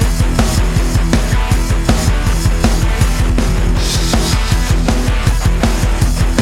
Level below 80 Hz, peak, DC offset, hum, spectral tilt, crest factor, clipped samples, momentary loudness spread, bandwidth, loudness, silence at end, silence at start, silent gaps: -14 dBFS; 0 dBFS; 0.6%; none; -5 dB/octave; 12 dB; under 0.1%; 1 LU; 16 kHz; -15 LUFS; 0 s; 0 s; none